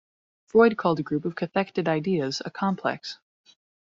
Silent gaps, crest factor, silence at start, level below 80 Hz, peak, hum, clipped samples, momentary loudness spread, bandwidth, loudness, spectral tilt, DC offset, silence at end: none; 20 dB; 0.55 s; -66 dBFS; -6 dBFS; none; under 0.1%; 11 LU; 7.6 kHz; -25 LUFS; -5 dB/octave; under 0.1%; 0.85 s